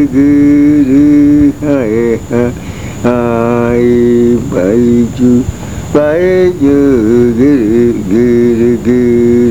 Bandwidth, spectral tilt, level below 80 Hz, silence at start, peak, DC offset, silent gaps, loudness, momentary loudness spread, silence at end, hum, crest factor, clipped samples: 13.5 kHz; -8 dB/octave; -30 dBFS; 0 s; 0 dBFS; 2%; none; -9 LUFS; 6 LU; 0 s; none; 8 dB; 0.3%